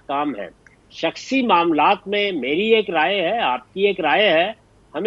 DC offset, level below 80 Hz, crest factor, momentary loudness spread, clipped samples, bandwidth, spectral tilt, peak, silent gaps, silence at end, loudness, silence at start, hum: under 0.1%; -60 dBFS; 16 dB; 10 LU; under 0.1%; 7.8 kHz; -4.5 dB/octave; -2 dBFS; none; 0 s; -19 LUFS; 0.1 s; none